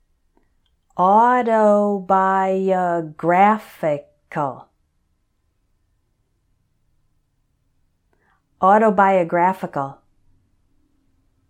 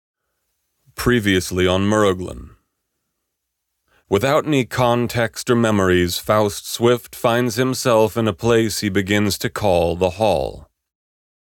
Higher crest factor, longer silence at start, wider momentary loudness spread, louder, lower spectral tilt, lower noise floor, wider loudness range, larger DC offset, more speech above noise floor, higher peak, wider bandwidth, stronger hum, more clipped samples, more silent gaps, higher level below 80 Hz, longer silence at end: about the same, 18 dB vs 16 dB; about the same, 0.95 s vs 1 s; first, 13 LU vs 5 LU; about the same, -18 LUFS vs -18 LUFS; first, -7.5 dB/octave vs -5 dB/octave; second, -67 dBFS vs -77 dBFS; first, 13 LU vs 4 LU; neither; second, 50 dB vs 59 dB; about the same, -2 dBFS vs -4 dBFS; second, 15.5 kHz vs 18.5 kHz; neither; neither; neither; second, -64 dBFS vs -44 dBFS; first, 1.55 s vs 0.85 s